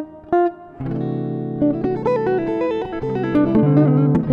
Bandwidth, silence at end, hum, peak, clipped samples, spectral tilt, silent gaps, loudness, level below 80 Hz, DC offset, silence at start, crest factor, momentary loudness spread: 5.2 kHz; 0 s; none; -4 dBFS; under 0.1%; -10.5 dB/octave; none; -19 LUFS; -46 dBFS; under 0.1%; 0 s; 16 dB; 10 LU